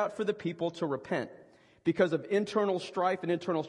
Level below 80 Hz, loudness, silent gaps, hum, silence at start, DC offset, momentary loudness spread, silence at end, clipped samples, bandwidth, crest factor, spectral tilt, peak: -76 dBFS; -32 LUFS; none; none; 0 s; under 0.1%; 7 LU; 0 s; under 0.1%; 11 kHz; 18 dB; -6.5 dB/octave; -14 dBFS